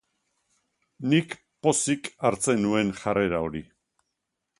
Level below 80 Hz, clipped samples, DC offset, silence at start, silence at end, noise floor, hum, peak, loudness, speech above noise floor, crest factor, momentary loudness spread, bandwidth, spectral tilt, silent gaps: -56 dBFS; under 0.1%; under 0.1%; 1 s; 0.95 s; -82 dBFS; none; -8 dBFS; -25 LUFS; 57 dB; 20 dB; 10 LU; 11.5 kHz; -4.5 dB/octave; none